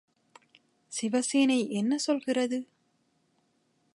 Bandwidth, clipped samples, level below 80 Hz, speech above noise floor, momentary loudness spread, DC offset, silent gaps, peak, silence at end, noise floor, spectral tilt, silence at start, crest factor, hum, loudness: 11.5 kHz; under 0.1%; -84 dBFS; 45 dB; 10 LU; under 0.1%; none; -14 dBFS; 1.3 s; -72 dBFS; -3.5 dB/octave; 0.9 s; 18 dB; none; -28 LUFS